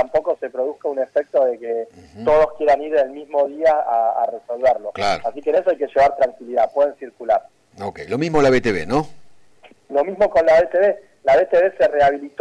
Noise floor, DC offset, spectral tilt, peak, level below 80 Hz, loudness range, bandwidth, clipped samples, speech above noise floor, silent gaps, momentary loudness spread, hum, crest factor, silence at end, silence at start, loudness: -50 dBFS; under 0.1%; -6 dB/octave; -8 dBFS; -48 dBFS; 3 LU; 10 kHz; under 0.1%; 32 dB; none; 9 LU; none; 12 dB; 0.15 s; 0 s; -19 LUFS